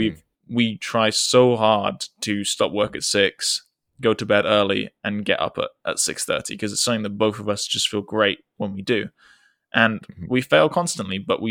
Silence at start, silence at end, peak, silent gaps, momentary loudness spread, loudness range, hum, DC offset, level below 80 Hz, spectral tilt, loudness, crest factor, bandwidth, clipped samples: 0 s; 0 s; -2 dBFS; none; 9 LU; 3 LU; none; under 0.1%; -60 dBFS; -3.5 dB/octave; -21 LUFS; 20 dB; 17.5 kHz; under 0.1%